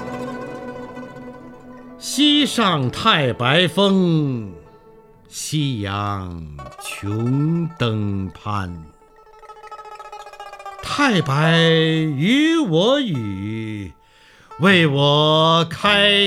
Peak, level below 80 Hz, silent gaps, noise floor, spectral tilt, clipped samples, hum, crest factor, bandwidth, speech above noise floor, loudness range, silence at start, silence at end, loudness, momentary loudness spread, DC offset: 0 dBFS; -52 dBFS; none; -50 dBFS; -5 dB/octave; under 0.1%; none; 18 dB; 14.5 kHz; 32 dB; 8 LU; 0 s; 0 s; -18 LUFS; 22 LU; under 0.1%